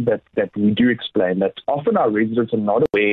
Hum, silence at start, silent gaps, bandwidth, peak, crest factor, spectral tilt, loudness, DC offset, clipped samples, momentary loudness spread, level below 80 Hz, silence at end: none; 0 s; none; 4.3 kHz; -8 dBFS; 12 dB; -9 dB/octave; -19 LUFS; under 0.1%; under 0.1%; 5 LU; -54 dBFS; 0 s